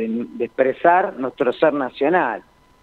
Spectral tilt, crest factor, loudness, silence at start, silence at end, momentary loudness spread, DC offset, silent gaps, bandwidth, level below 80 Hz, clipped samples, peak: -7.5 dB/octave; 18 dB; -19 LUFS; 0 s; 0.45 s; 9 LU; under 0.1%; none; 4.6 kHz; -62 dBFS; under 0.1%; 0 dBFS